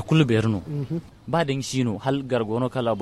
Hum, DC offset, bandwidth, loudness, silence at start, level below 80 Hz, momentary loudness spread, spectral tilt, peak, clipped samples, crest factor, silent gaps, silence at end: none; under 0.1%; 12.5 kHz; -24 LUFS; 0 s; -52 dBFS; 9 LU; -6.5 dB/octave; -6 dBFS; under 0.1%; 18 dB; none; 0 s